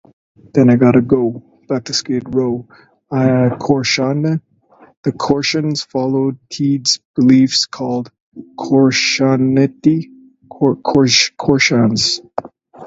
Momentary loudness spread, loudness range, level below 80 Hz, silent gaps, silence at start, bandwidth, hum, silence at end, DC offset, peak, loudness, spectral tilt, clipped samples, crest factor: 12 LU; 4 LU; -50 dBFS; 4.97-5.03 s, 7.05-7.14 s, 8.20-8.32 s; 0.55 s; 8 kHz; none; 0 s; under 0.1%; 0 dBFS; -15 LUFS; -5 dB/octave; under 0.1%; 16 dB